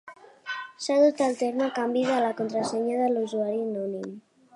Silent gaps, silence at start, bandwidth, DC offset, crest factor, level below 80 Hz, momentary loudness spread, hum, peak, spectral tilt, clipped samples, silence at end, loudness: none; 0.05 s; 11.5 kHz; under 0.1%; 16 dB; -80 dBFS; 14 LU; none; -10 dBFS; -4.5 dB/octave; under 0.1%; 0.35 s; -26 LUFS